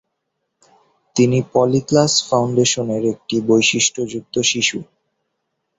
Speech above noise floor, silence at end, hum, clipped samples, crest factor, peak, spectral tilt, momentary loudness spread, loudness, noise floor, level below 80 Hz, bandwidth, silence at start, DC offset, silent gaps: 58 dB; 0.95 s; none; under 0.1%; 18 dB; -2 dBFS; -3.5 dB/octave; 7 LU; -17 LUFS; -75 dBFS; -56 dBFS; 8.2 kHz; 1.15 s; under 0.1%; none